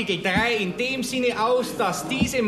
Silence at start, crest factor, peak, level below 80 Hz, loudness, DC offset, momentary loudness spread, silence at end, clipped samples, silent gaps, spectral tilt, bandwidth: 0 s; 16 dB; -8 dBFS; -48 dBFS; -23 LUFS; under 0.1%; 4 LU; 0 s; under 0.1%; none; -4 dB/octave; 13.5 kHz